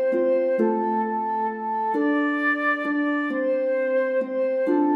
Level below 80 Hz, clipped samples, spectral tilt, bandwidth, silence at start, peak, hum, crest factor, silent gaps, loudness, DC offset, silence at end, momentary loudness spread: -90 dBFS; under 0.1%; -7.5 dB/octave; 5.6 kHz; 0 s; -10 dBFS; none; 12 dB; none; -23 LUFS; under 0.1%; 0 s; 4 LU